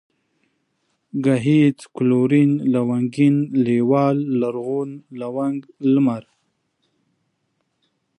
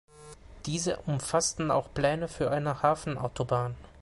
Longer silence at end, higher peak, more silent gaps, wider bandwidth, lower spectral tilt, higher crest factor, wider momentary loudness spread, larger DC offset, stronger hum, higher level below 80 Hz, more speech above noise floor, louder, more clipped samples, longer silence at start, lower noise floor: first, 2 s vs 0.05 s; first, -6 dBFS vs -10 dBFS; neither; about the same, 10.5 kHz vs 11.5 kHz; first, -8.5 dB/octave vs -4.5 dB/octave; second, 14 dB vs 20 dB; first, 10 LU vs 7 LU; neither; neither; second, -68 dBFS vs -52 dBFS; first, 53 dB vs 20 dB; first, -19 LUFS vs -30 LUFS; neither; first, 1.15 s vs 0.15 s; first, -71 dBFS vs -50 dBFS